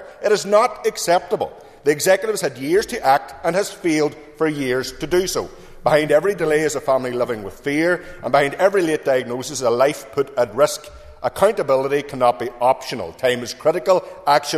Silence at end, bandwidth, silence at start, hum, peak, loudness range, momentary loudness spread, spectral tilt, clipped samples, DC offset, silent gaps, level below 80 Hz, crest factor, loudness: 0 s; 14 kHz; 0 s; none; -2 dBFS; 1 LU; 7 LU; -4 dB/octave; under 0.1%; under 0.1%; none; -48 dBFS; 18 dB; -19 LUFS